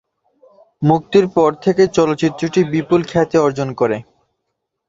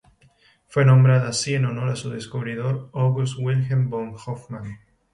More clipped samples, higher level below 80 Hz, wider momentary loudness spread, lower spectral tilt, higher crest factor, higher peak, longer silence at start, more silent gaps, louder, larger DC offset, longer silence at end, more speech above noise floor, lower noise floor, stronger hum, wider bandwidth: neither; first, -52 dBFS vs -58 dBFS; second, 5 LU vs 17 LU; about the same, -7 dB/octave vs -6 dB/octave; about the same, 16 dB vs 16 dB; first, -2 dBFS vs -6 dBFS; about the same, 0.8 s vs 0.7 s; neither; first, -16 LUFS vs -22 LUFS; neither; first, 0.85 s vs 0.35 s; first, 60 dB vs 37 dB; first, -75 dBFS vs -58 dBFS; neither; second, 7.8 kHz vs 11 kHz